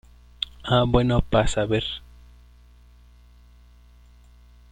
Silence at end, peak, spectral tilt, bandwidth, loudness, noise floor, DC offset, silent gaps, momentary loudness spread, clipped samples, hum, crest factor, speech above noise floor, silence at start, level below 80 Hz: 2.75 s; -4 dBFS; -6 dB/octave; 10 kHz; -23 LUFS; -51 dBFS; under 0.1%; none; 13 LU; under 0.1%; 60 Hz at -45 dBFS; 22 dB; 30 dB; 0.4 s; -36 dBFS